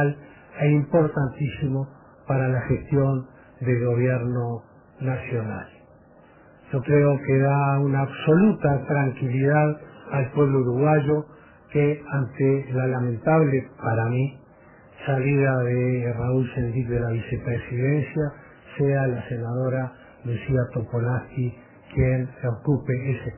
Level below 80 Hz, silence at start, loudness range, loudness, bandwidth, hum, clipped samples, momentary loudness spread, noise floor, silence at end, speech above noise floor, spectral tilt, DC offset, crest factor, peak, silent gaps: -48 dBFS; 0 s; 5 LU; -24 LUFS; 3.2 kHz; none; under 0.1%; 11 LU; -52 dBFS; 0 s; 29 dB; -12.5 dB/octave; under 0.1%; 18 dB; -6 dBFS; none